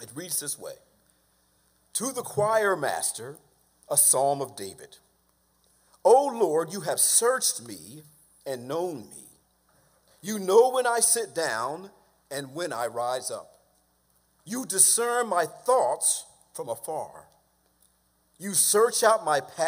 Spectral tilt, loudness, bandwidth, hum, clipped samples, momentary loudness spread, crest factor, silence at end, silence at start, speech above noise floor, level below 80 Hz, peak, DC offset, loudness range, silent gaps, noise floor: -1.5 dB/octave; -24 LUFS; 16 kHz; none; under 0.1%; 20 LU; 24 dB; 0 s; 0 s; 42 dB; -74 dBFS; -4 dBFS; under 0.1%; 5 LU; none; -68 dBFS